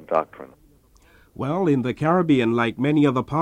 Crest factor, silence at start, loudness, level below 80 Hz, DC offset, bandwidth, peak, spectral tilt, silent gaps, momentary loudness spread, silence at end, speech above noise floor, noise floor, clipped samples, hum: 16 dB; 0 s; -21 LUFS; -54 dBFS; under 0.1%; 9.2 kHz; -6 dBFS; -8 dB/octave; none; 8 LU; 0 s; 34 dB; -55 dBFS; under 0.1%; none